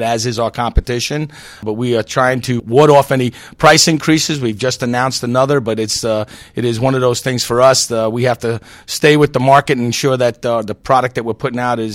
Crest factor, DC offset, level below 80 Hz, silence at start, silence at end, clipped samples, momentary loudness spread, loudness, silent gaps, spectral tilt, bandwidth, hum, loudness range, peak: 14 dB; under 0.1%; -32 dBFS; 0 s; 0 s; 0.2%; 10 LU; -14 LUFS; none; -4.5 dB/octave; 16.5 kHz; none; 3 LU; 0 dBFS